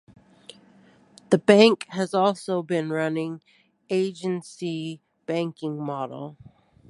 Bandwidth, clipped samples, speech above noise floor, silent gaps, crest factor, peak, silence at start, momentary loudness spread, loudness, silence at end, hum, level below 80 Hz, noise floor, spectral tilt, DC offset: 11.5 kHz; under 0.1%; 32 dB; none; 24 dB; -2 dBFS; 1.3 s; 17 LU; -24 LUFS; 0.55 s; none; -70 dBFS; -56 dBFS; -5.5 dB/octave; under 0.1%